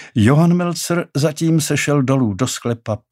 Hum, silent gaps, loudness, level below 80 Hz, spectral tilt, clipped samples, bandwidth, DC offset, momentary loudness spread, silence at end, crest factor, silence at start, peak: none; none; -17 LUFS; -56 dBFS; -5.5 dB/octave; under 0.1%; 16 kHz; under 0.1%; 8 LU; 0.15 s; 16 dB; 0 s; -2 dBFS